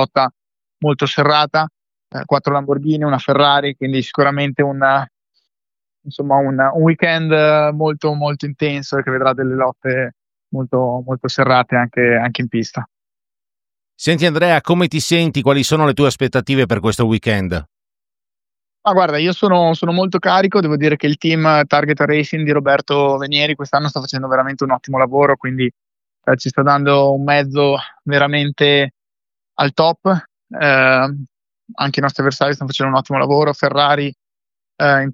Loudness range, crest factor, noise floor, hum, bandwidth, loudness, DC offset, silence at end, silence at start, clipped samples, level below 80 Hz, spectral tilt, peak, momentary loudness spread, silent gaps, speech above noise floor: 3 LU; 16 dB; under -90 dBFS; none; 14.5 kHz; -15 LUFS; under 0.1%; 0 s; 0 s; under 0.1%; -52 dBFS; -6 dB/octave; 0 dBFS; 8 LU; none; over 75 dB